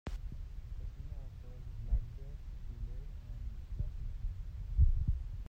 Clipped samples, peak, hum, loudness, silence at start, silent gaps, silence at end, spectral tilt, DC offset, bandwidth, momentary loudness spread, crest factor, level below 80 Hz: under 0.1%; -16 dBFS; none; -42 LUFS; 0.05 s; none; 0 s; -8.5 dB/octave; under 0.1%; 5.8 kHz; 16 LU; 20 dB; -38 dBFS